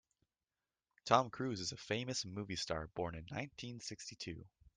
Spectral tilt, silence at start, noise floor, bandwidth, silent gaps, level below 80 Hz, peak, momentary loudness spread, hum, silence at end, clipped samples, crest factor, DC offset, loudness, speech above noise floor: -4 dB/octave; 1.05 s; under -90 dBFS; 10.5 kHz; none; -66 dBFS; -16 dBFS; 14 LU; none; 0.3 s; under 0.1%; 26 dB; under 0.1%; -40 LUFS; over 50 dB